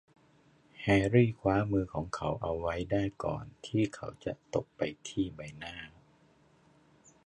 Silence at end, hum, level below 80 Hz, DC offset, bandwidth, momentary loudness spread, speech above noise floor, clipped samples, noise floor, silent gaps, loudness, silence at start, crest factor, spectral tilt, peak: 1.4 s; none; -54 dBFS; under 0.1%; 10.5 kHz; 16 LU; 33 dB; under 0.1%; -65 dBFS; none; -33 LUFS; 0.8 s; 22 dB; -7 dB/octave; -12 dBFS